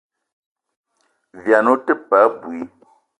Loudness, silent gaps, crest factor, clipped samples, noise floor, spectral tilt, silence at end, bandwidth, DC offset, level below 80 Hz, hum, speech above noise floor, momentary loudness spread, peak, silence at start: -16 LUFS; none; 20 dB; under 0.1%; -67 dBFS; -6.5 dB/octave; 0.55 s; 10.5 kHz; under 0.1%; -68 dBFS; none; 51 dB; 16 LU; 0 dBFS; 1.35 s